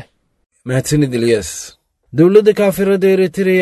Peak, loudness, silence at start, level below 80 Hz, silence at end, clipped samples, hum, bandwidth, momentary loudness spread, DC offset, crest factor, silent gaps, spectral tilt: 0 dBFS; -13 LUFS; 0.65 s; -44 dBFS; 0 s; under 0.1%; none; 12.5 kHz; 16 LU; under 0.1%; 14 dB; none; -6 dB/octave